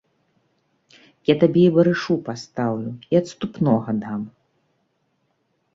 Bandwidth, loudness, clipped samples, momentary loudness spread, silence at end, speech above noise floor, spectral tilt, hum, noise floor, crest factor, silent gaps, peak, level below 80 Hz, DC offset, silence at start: 7.8 kHz; -21 LUFS; under 0.1%; 15 LU; 1.45 s; 50 dB; -7.5 dB/octave; none; -69 dBFS; 20 dB; none; -2 dBFS; -62 dBFS; under 0.1%; 1.3 s